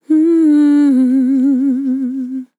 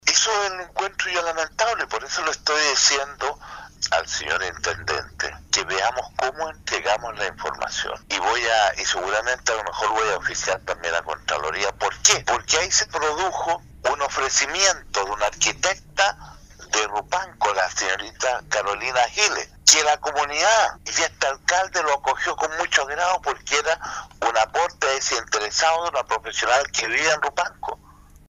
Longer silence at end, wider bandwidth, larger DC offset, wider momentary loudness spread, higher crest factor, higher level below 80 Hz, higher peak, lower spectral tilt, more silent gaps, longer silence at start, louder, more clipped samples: second, 0.15 s vs 0.55 s; second, 11 kHz vs 15.5 kHz; neither; about the same, 9 LU vs 9 LU; second, 8 dB vs 22 dB; second, under -90 dBFS vs -50 dBFS; second, -6 dBFS vs 0 dBFS; first, -6.5 dB/octave vs 0 dB/octave; neither; about the same, 0.1 s vs 0.05 s; first, -12 LUFS vs -21 LUFS; neither